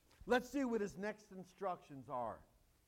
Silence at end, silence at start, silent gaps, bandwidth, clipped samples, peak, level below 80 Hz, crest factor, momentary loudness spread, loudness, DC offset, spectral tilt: 0.45 s; 0.2 s; none; 16.5 kHz; under 0.1%; -22 dBFS; -70 dBFS; 20 dB; 15 LU; -42 LUFS; under 0.1%; -5 dB/octave